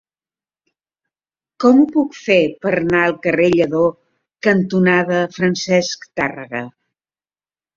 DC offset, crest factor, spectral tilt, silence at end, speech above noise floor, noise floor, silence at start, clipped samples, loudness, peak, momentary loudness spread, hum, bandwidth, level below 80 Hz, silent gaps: under 0.1%; 16 dB; -6 dB/octave; 1.05 s; over 74 dB; under -90 dBFS; 1.6 s; under 0.1%; -16 LUFS; -2 dBFS; 9 LU; none; 7.6 kHz; -56 dBFS; none